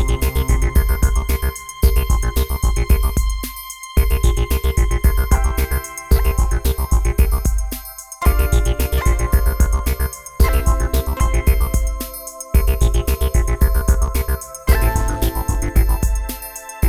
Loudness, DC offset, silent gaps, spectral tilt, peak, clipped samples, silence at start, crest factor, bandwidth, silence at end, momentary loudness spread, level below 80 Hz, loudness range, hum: -19 LUFS; under 0.1%; none; -5.5 dB/octave; -2 dBFS; under 0.1%; 0 s; 14 dB; 15.5 kHz; 0 s; 7 LU; -16 dBFS; 1 LU; none